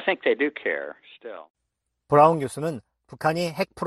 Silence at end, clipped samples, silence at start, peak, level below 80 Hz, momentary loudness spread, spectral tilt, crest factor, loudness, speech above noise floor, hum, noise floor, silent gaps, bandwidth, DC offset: 0 s; under 0.1%; 0 s; -4 dBFS; -64 dBFS; 23 LU; -6 dB/octave; 22 dB; -23 LUFS; 56 dB; none; -80 dBFS; 1.50-1.54 s; 13 kHz; under 0.1%